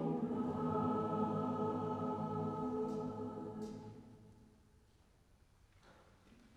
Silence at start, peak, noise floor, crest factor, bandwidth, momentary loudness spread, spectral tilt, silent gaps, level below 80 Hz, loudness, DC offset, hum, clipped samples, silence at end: 0 s; -26 dBFS; -69 dBFS; 16 dB; 10 kHz; 12 LU; -9 dB/octave; none; -70 dBFS; -40 LUFS; under 0.1%; none; under 0.1%; 0.1 s